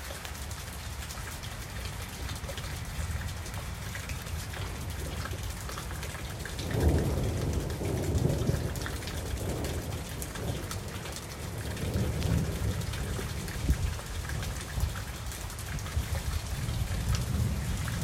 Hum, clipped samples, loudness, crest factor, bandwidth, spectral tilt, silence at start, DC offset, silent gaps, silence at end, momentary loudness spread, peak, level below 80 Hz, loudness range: none; under 0.1%; -34 LUFS; 20 dB; 16.5 kHz; -5 dB/octave; 0 s; under 0.1%; none; 0 s; 8 LU; -12 dBFS; -38 dBFS; 6 LU